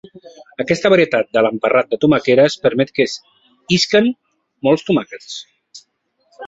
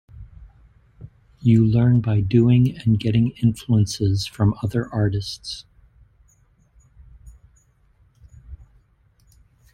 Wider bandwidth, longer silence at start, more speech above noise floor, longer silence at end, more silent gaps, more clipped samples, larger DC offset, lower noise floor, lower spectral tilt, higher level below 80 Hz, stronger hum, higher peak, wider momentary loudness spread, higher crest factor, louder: second, 8 kHz vs 11.5 kHz; about the same, 0.15 s vs 0.15 s; first, 49 dB vs 40 dB; second, 0 s vs 1.2 s; neither; neither; neither; first, -64 dBFS vs -59 dBFS; second, -5 dB/octave vs -7.5 dB/octave; second, -56 dBFS vs -46 dBFS; neither; first, -2 dBFS vs -6 dBFS; first, 17 LU vs 10 LU; about the same, 16 dB vs 16 dB; first, -15 LUFS vs -20 LUFS